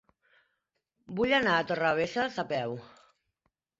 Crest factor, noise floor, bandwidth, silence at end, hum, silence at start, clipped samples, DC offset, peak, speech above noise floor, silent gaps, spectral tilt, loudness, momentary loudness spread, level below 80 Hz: 20 dB; -81 dBFS; 7.8 kHz; 0.95 s; none; 1.1 s; under 0.1%; under 0.1%; -12 dBFS; 53 dB; none; -5 dB/octave; -29 LUFS; 13 LU; -64 dBFS